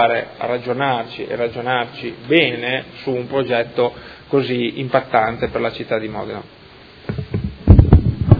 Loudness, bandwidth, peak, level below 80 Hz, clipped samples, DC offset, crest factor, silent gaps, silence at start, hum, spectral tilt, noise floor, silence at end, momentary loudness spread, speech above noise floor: -18 LUFS; 5 kHz; 0 dBFS; -26 dBFS; 0.1%; under 0.1%; 18 dB; none; 0 s; none; -9.5 dB/octave; -37 dBFS; 0 s; 14 LU; 17 dB